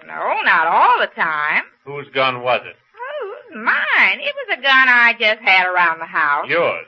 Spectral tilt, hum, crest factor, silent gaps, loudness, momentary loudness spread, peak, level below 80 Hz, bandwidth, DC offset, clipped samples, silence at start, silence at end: -4 dB/octave; none; 16 dB; none; -15 LUFS; 17 LU; 0 dBFS; -76 dBFS; 6.8 kHz; under 0.1%; under 0.1%; 0.05 s; 0.05 s